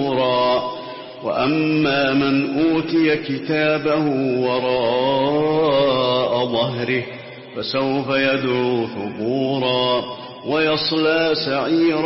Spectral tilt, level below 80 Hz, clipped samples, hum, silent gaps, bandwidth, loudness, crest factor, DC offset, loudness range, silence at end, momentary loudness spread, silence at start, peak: -9.5 dB/octave; -56 dBFS; under 0.1%; none; none; 5.8 kHz; -19 LUFS; 12 dB; under 0.1%; 2 LU; 0 s; 8 LU; 0 s; -6 dBFS